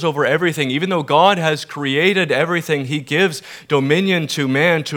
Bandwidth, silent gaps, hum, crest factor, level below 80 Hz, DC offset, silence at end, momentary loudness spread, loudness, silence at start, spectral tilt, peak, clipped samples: 19 kHz; none; none; 16 dB; -70 dBFS; under 0.1%; 0 s; 7 LU; -17 LUFS; 0 s; -5 dB/octave; 0 dBFS; under 0.1%